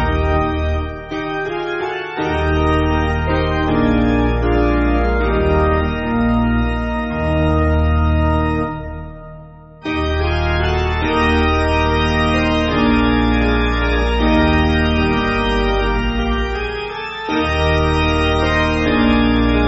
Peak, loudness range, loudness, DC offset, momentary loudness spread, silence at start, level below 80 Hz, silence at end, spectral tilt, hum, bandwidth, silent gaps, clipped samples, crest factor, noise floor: -2 dBFS; 3 LU; -17 LUFS; under 0.1%; 7 LU; 0 s; -22 dBFS; 0 s; -5 dB/octave; none; 8 kHz; none; under 0.1%; 14 dB; -37 dBFS